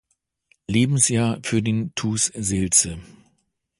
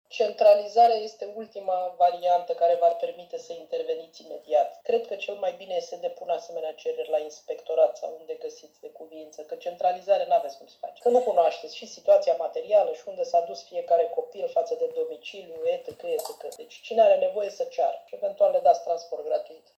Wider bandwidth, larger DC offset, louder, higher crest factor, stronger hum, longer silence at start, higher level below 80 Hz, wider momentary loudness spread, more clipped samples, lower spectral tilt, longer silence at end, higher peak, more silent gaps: second, 11.5 kHz vs 14 kHz; neither; first, -20 LUFS vs -26 LUFS; about the same, 20 dB vs 18 dB; neither; first, 0.7 s vs 0.1 s; first, -48 dBFS vs -82 dBFS; second, 9 LU vs 18 LU; neither; about the same, -4 dB/octave vs -3 dB/octave; first, 0.75 s vs 0.2 s; first, -2 dBFS vs -8 dBFS; neither